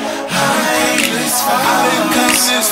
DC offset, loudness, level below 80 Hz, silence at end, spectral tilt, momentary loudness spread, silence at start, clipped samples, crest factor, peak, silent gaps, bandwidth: under 0.1%; -13 LUFS; -50 dBFS; 0 s; -2 dB/octave; 3 LU; 0 s; under 0.1%; 14 dB; 0 dBFS; none; 16.5 kHz